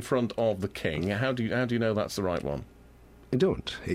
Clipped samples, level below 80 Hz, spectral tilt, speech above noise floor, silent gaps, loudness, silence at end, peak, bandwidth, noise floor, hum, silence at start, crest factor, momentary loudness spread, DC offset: under 0.1%; -52 dBFS; -6 dB/octave; 25 dB; none; -29 LUFS; 0 s; -14 dBFS; 16 kHz; -53 dBFS; none; 0 s; 16 dB; 6 LU; under 0.1%